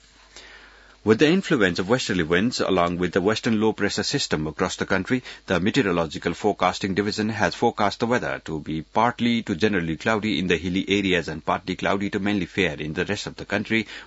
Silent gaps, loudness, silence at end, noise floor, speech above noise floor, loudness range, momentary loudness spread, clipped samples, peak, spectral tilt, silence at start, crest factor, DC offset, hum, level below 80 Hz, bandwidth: none; -23 LUFS; 0 s; -49 dBFS; 26 dB; 2 LU; 6 LU; under 0.1%; -6 dBFS; -5 dB/octave; 0.35 s; 18 dB; under 0.1%; none; -52 dBFS; 8 kHz